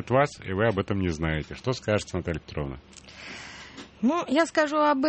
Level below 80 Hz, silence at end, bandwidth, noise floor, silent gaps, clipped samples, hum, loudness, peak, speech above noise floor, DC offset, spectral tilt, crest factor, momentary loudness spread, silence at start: -46 dBFS; 0 s; 8.4 kHz; -45 dBFS; none; under 0.1%; none; -27 LUFS; -8 dBFS; 19 dB; under 0.1%; -6 dB/octave; 20 dB; 18 LU; 0 s